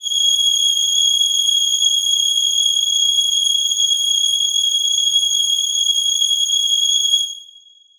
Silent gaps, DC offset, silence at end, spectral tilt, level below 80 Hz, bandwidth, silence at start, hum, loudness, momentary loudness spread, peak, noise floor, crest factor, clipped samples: none; under 0.1%; 0.55 s; 7.5 dB/octave; -66 dBFS; over 20 kHz; 0 s; none; -13 LUFS; 2 LU; -4 dBFS; -47 dBFS; 12 dB; under 0.1%